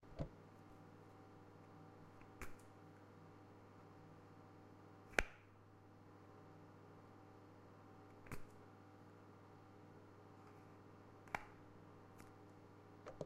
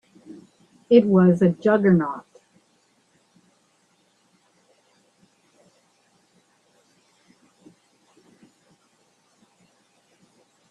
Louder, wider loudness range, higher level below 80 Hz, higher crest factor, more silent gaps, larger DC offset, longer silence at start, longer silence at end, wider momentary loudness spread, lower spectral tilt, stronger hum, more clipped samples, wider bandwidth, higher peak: second, -56 LUFS vs -18 LUFS; about the same, 10 LU vs 9 LU; about the same, -66 dBFS vs -68 dBFS; first, 40 dB vs 24 dB; neither; neither; second, 0 s vs 0.3 s; second, 0 s vs 8.5 s; second, 12 LU vs 30 LU; second, -4.5 dB/octave vs -9 dB/octave; neither; neither; first, 14 kHz vs 7 kHz; second, -16 dBFS vs -2 dBFS